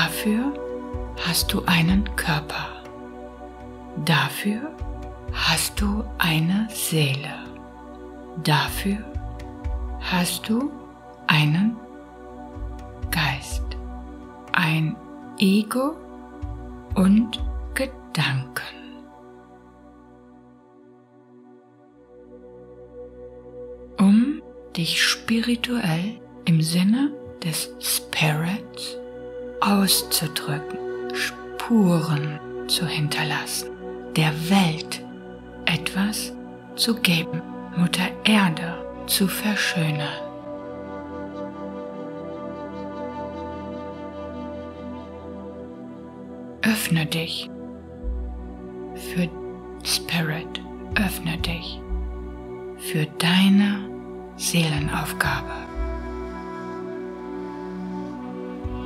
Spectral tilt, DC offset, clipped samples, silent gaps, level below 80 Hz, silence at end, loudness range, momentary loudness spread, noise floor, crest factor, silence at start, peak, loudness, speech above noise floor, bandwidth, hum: -4.5 dB/octave; under 0.1%; under 0.1%; none; -40 dBFS; 0 s; 9 LU; 19 LU; -52 dBFS; 26 dB; 0 s; 0 dBFS; -24 LUFS; 29 dB; 16 kHz; none